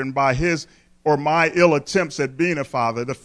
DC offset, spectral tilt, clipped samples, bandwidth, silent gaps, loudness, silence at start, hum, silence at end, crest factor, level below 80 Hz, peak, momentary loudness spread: under 0.1%; -5.5 dB/octave; under 0.1%; 11 kHz; none; -20 LUFS; 0 s; none; 0.1 s; 18 dB; -44 dBFS; -2 dBFS; 8 LU